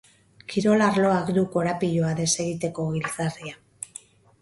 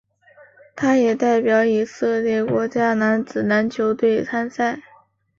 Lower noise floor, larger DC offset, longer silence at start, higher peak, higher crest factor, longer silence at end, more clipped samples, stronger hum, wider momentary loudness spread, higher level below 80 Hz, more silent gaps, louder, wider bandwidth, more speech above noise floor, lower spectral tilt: second, -47 dBFS vs -54 dBFS; neither; second, 0.5 s vs 0.75 s; about the same, -8 dBFS vs -6 dBFS; about the same, 18 dB vs 14 dB; about the same, 0.55 s vs 0.6 s; neither; neither; first, 18 LU vs 6 LU; about the same, -58 dBFS vs -62 dBFS; neither; second, -24 LUFS vs -19 LUFS; first, 11.5 kHz vs 7.4 kHz; second, 24 dB vs 35 dB; about the same, -5 dB/octave vs -6 dB/octave